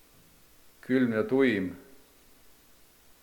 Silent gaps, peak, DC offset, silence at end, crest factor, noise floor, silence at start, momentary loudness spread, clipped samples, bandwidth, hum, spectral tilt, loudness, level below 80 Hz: none; -12 dBFS; under 0.1%; 1.4 s; 20 dB; -58 dBFS; 0.9 s; 22 LU; under 0.1%; 19 kHz; 60 Hz at -55 dBFS; -7 dB/octave; -27 LUFS; -68 dBFS